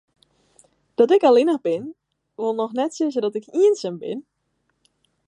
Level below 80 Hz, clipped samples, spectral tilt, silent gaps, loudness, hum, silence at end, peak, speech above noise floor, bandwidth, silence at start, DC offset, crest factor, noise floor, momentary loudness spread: -78 dBFS; under 0.1%; -5.5 dB/octave; none; -20 LUFS; none; 1.05 s; -4 dBFS; 52 dB; 10 kHz; 1 s; under 0.1%; 18 dB; -72 dBFS; 16 LU